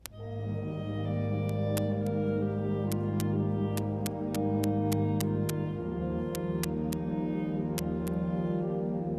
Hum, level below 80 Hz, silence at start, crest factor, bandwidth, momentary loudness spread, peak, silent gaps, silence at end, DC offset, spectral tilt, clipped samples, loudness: none; -52 dBFS; 0.05 s; 20 dB; 14 kHz; 5 LU; -10 dBFS; none; 0 s; under 0.1%; -7 dB/octave; under 0.1%; -32 LUFS